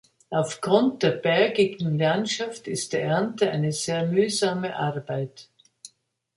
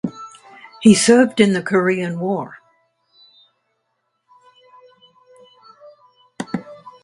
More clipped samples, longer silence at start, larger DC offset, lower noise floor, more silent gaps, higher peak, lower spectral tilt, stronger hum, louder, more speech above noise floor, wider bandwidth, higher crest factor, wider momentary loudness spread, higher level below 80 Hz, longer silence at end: neither; first, 0.3 s vs 0.05 s; neither; second, -61 dBFS vs -71 dBFS; neither; second, -6 dBFS vs 0 dBFS; about the same, -5 dB/octave vs -4.5 dB/octave; neither; second, -24 LUFS vs -16 LUFS; second, 37 dB vs 57 dB; about the same, 11.5 kHz vs 11.5 kHz; about the same, 18 dB vs 20 dB; second, 9 LU vs 23 LU; second, -68 dBFS vs -60 dBFS; first, 0.5 s vs 0.15 s